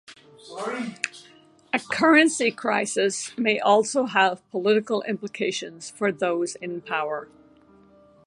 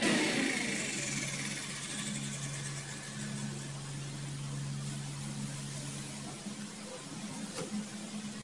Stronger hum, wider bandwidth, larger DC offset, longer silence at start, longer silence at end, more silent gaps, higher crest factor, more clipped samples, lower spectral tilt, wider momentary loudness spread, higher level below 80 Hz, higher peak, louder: neither; about the same, 11.5 kHz vs 11.5 kHz; neither; about the same, 0.1 s vs 0 s; first, 1 s vs 0 s; neither; about the same, 22 dB vs 20 dB; neither; about the same, -3.5 dB/octave vs -3.5 dB/octave; first, 14 LU vs 10 LU; second, -74 dBFS vs -68 dBFS; first, -2 dBFS vs -18 dBFS; first, -24 LUFS vs -37 LUFS